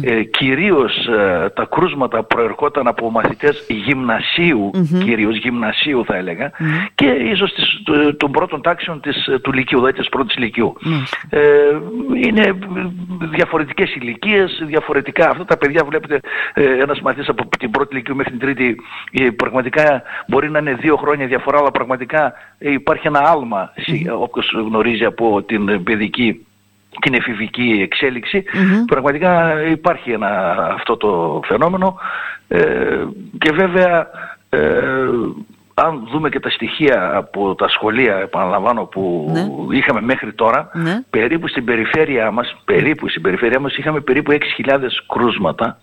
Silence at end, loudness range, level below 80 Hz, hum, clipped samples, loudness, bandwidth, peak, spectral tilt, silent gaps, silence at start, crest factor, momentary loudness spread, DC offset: 0.1 s; 2 LU; -46 dBFS; none; under 0.1%; -16 LUFS; 15.5 kHz; 0 dBFS; -7 dB/octave; none; 0 s; 16 dB; 7 LU; under 0.1%